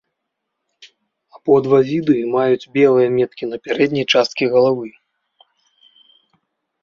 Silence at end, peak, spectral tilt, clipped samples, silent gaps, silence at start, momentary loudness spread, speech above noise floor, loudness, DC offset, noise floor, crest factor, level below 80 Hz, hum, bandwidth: 1.95 s; -2 dBFS; -6 dB/octave; under 0.1%; none; 1.45 s; 10 LU; 61 dB; -16 LUFS; under 0.1%; -77 dBFS; 16 dB; -62 dBFS; none; 7.2 kHz